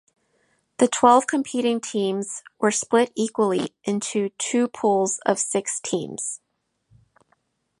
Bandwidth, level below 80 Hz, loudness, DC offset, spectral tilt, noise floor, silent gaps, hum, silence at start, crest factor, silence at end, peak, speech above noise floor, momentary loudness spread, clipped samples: 11.5 kHz; -72 dBFS; -22 LUFS; under 0.1%; -3.5 dB/octave; -68 dBFS; none; none; 0.8 s; 22 dB; 1.45 s; -2 dBFS; 46 dB; 11 LU; under 0.1%